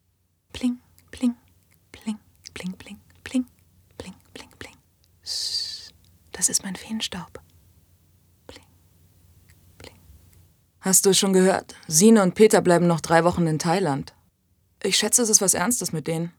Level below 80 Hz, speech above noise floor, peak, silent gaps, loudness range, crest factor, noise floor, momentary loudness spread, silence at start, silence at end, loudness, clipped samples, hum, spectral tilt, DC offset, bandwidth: -60 dBFS; 48 dB; -2 dBFS; none; 17 LU; 22 dB; -68 dBFS; 25 LU; 0.55 s; 0.1 s; -21 LUFS; under 0.1%; none; -3.5 dB/octave; under 0.1%; over 20 kHz